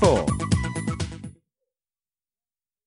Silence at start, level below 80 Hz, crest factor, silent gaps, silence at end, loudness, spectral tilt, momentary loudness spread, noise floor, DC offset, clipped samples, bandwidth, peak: 0 s; -40 dBFS; 20 dB; none; 1.55 s; -25 LUFS; -6 dB/octave; 17 LU; under -90 dBFS; under 0.1%; under 0.1%; 11 kHz; -6 dBFS